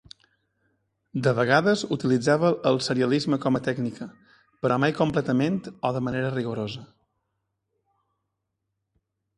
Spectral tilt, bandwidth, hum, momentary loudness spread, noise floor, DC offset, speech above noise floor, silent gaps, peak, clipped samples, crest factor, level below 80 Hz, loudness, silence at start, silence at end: -6 dB/octave; 11.5 kHz; none; 11 LU; -81 dBFS; under 0.1%; 57 dB; none; -4 dBFS; under 0.1%; 22 dB; -62 dBFS; -24 LUFS; 1.15 s; 2.5 s